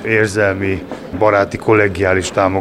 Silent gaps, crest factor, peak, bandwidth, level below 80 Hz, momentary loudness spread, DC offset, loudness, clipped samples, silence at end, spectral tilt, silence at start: none; 14 dB; 0 dBFS; 13.5 kHz; -44 dBFS; 7 LU; under 0.1%; -15 LUFS; under 0.1%; 0 s; -5.5 dB/octave; 0 s